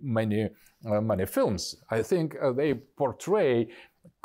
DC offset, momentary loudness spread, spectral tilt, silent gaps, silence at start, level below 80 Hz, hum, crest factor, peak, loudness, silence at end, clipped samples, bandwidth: under 0.1%; 7 LU; -6 dB/octave; none; 0 s; -60 dBFS; none; 12 dB; -16 dBFS; -28 LUFS; 0.15 s; under 0.1%; 16 kHz